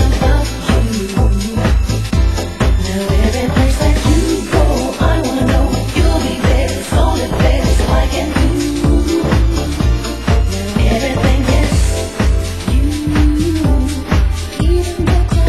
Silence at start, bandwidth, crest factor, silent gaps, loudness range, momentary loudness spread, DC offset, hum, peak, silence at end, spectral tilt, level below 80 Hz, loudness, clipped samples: 0 s; 12.5 kHz; 12 dB; none; 1 LU; 3 LU; 0.7%; none; 0 dBFS; 0 s; -6 dB/octave; -16 dBFS; -15 LUFS; under 0.1%